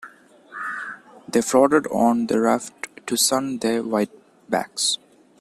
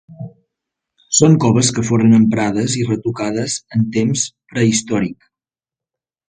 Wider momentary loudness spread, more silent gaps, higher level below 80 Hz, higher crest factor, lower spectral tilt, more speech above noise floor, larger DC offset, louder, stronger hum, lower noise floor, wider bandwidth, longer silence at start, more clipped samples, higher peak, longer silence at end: first, 15 LU vs 10 LU; neither; second, -64 dBFS vs -50 dBFS; about the same, 20 dB vs 16 dB; second, -3 dB/octave vs -5 dB/octave; second, 27 dB vs 75 dB; neither; second, -21 LUFS vs -16 LUFS; neither; second, -47 dBFS vs -90 dBFS; first, 14.5 kHz vs 9.6 kHz; about the same, 0 s vs 0.1 s; neither; about the same, -2 dBFS vs 0 dBFS; second, 0.45 s vs 1.15 s